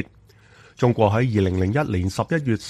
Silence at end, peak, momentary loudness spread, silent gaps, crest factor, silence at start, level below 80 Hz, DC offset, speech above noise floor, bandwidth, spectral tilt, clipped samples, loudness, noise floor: 0 s; -4 dBFS; 5 LU; none; 18 dB; 0 s; -48 dBFS; under 0.1%; 31 dB; 12.5 kHz; -7.5 dB/octave; under 0.1%; -21 LUFS; -52 dBFS